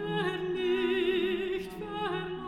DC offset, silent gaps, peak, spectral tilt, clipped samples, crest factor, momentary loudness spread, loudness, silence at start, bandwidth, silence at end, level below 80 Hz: under 0.1%; none; -18 dBFS; -6.5 dB/octave; under 0.1%; 12 dB; 7 LU; -31 LUFS; 0 s; 13 kHz; 0 s; -58 dBFS